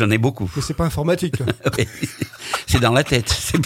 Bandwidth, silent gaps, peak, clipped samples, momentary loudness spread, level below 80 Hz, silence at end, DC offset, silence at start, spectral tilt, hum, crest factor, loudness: 16.5 kHz; none; 0 dBFS; under 0.1%; 10 LU; -38 dBFS; 0 s; under 0.1%; 0 s; -5 dB/octave; none; 20 dB; -20 LUFS